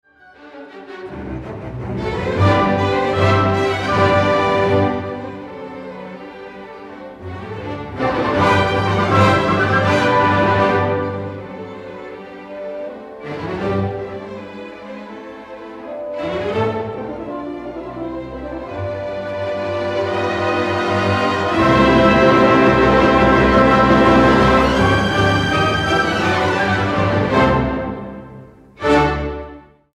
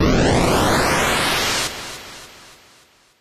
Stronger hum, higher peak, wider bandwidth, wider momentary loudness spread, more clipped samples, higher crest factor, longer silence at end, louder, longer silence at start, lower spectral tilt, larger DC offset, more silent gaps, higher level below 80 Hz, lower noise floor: neither; first, 0 dBFS vs -6 dBFS; second, 11.5 kHz vs 14 kHz; first, 21 LU vs 18 LU; neither; about the same, 16 dB vs 14 dB; second, 0.35 s vs 0.75 s; about the same, -16 LUFS vs -17 LUFS; first, 0.4 s vs 0 s; first, -6.5 dB/octave vs -4 dB/octave; neither; neither; about the same, -36 dBFS vs -32 dBFS; second, -43 dBFS vs -53 dBFS